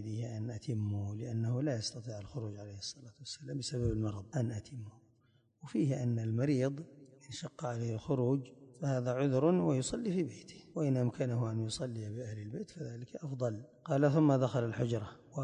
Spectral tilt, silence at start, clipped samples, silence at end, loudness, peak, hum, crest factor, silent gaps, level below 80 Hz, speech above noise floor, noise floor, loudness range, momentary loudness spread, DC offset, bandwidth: -7 dB/octave; 0 s; under 0.1%; 0 s; -36 LUFS; -16 dBFS; none; 20 dB; none; -60 dBFS; 36 dB; -71 dBFS; 5 LU; 15 LU; under 0.1%; 10.5 kHz